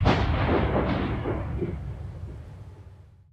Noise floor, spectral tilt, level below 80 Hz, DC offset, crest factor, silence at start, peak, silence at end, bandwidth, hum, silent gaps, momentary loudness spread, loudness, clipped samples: -49 dBFS; -8 dB/octave; -34 dBFS; under 0.1%; 18 dB; 0 s; -8 dBFS; 0.3 s; 8 kHz; none; none; 20 LU; -27 LUFS; under 0.1%